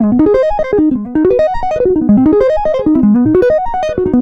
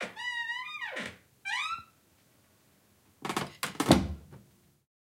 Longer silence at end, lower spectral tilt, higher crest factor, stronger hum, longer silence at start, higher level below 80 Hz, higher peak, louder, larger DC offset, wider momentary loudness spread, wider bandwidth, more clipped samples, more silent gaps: second, 0 s vs 0.6 s; first, -9 dB/octave vs -4.5 dB/octave; second, 10 dB vs 30 dB; neither; about the same, 0 s vs 0 s; first, -30 dBFS vs -50 dBFS; first, 0 dBFS vs -6 dBFS; first, -11 LUFS vs -32 LUFS; neither; second, 5 LU vs 16 LU; second, 6.6 kHz vs 16.5 kHz; neither; neither